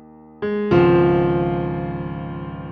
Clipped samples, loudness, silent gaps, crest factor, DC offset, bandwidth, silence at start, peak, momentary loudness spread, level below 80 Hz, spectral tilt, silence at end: under 0.1%; -19 LUFS; none; 16 dB; under 0.1%; 5 kHz; 0 s; -4 dBFS; 15 LU; -42 dBFS; -10 dB/octave; 0 s